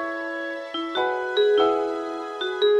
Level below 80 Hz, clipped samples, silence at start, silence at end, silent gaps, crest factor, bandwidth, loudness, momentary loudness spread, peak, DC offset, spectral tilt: -68 dBFS; under 0.1%; 0 s; 0 s; none; 14 dB; 8.4 kHz; -24 LUFS; 10 LU; -10 dBFS; under 0.1%; -3 dB/octave